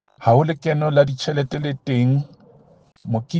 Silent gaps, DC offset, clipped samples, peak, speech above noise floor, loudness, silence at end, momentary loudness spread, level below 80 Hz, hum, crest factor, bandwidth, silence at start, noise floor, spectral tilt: none; under 0.1%; under 0.1%; -2 dBFS; 34 dB; -20 LUFS; 0 s; 10 LU; -56 dBFS; none; 18 dB; 7.6 kHz; 0.2 s; -52 dBFS; -7.5 dB/octave